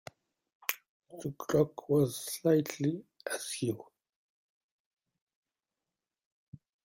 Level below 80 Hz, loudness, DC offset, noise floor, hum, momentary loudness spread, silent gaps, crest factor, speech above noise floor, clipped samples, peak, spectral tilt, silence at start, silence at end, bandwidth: -72 dBFS; -33 LUFS; under 0.1%; under -90 dBFS; none; 15 LU; 0.89-1.00 s, 4.16-4.97 s, 5.21-5.27 s, 5.35-5.43 s, 6.25-6.52 s; 28 dB; over 59 dB; under 0.1%; -8 dBFS; -5.5 dB/octave; 0.7 s; 0.3 s; 16.5 kHz